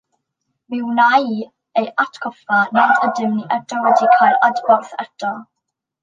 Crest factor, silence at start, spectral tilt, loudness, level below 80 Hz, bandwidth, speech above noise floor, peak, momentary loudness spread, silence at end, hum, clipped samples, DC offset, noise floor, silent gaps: 16 dB; 0.7 s; -5 dB/octave; -16 LUFS; -72 dBFS; 7.6 kHz; 63 dB; -2 dBFS; 13 LU; 0.6 s; none; under 0.1%; under 0.1%; -79 dBFS; none